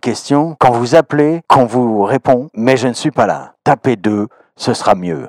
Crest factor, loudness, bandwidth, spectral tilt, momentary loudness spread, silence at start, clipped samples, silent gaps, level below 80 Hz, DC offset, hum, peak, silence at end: 14 dB; -13 LUFS; 13.5 kHz; -6 dB/octave; 7 LU; 0.05 s; 0.8%; none; -52 dBFS; under 0.1%; none; 0 dBFS; 0 s